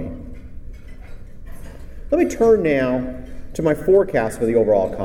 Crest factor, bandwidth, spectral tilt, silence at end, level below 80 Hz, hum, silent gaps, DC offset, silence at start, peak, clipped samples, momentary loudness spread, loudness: 16 dB; 16 kHz; -7 dB/octave; 0 s; -36 dBFS; none; none; under 0.1%; 0 s; -4 dBFS; under 0.1%; 24 LU; -18 LUFS